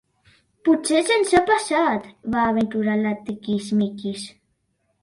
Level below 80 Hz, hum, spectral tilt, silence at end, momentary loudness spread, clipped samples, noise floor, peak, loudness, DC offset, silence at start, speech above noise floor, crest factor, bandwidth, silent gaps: -54 dBFS; none; -4.5 dB/octave; 0.7 s; 12 LU; under 0.1%; -70 dBFS; -4 dBFS; -21 LUFS; under 0.1%; 0.65 s; 49 dB; 18 dB; 11.5 kHz; none